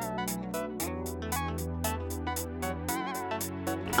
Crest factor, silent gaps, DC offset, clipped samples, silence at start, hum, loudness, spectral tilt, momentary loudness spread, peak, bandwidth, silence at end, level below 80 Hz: 22 dB; none; under 0.1%; under 0.1%; 0 s; none; -34 LUFS; -4.5 dB/octave; 2 LU; -10 dBFS; over 20 kHz; 0 s; -46 dBFS